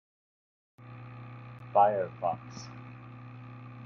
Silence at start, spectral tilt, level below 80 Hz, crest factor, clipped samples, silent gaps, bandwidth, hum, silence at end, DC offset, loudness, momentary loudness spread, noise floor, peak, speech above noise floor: 0.8 s; -6.5 dB/octave; -72 dBFS; 24 dB; under 0.1%; none; 7.2 kHz; none; 0 s; under 0.1%; -29 LUFS; 22 LU; -47 dBFS; -10 dBFS; 18 dB